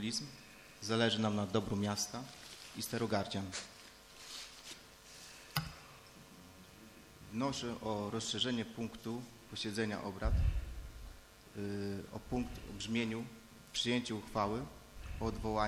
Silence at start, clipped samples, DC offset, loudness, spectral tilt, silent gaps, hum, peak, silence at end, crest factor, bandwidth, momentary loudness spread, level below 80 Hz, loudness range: 0 s; under 0.1%; under 0.1%; -39 LUFS; -4.5 dB/octave; none; none; -16 dBFS; 0 s; 24 dB; 16 kHz; 20 LU; -48 dBFS; 8 LU